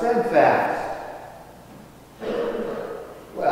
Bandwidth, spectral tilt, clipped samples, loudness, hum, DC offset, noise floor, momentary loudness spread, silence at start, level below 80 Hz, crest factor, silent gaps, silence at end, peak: 16 kHz; -6 dB/octave; under 0.1%; -23 LUFS; none; under 0.1%; -45 dBFS; 26 LU; 0 s; -54 dBFS; 20 dB; none; 0 s; -4 dBFS